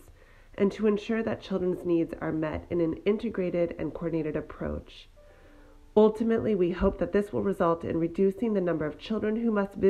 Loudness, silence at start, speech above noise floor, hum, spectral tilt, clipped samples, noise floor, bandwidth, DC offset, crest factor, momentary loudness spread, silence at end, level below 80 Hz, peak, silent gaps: -28 LUFS; 0.1 s; 26 dB; none; -8.5 dB/octave; under 0.1%; -53 dBFS; 10 kHz; under 0.1%; 18 dB; 6 LU; 0 s; -48 dBFS; -10 dBFS; none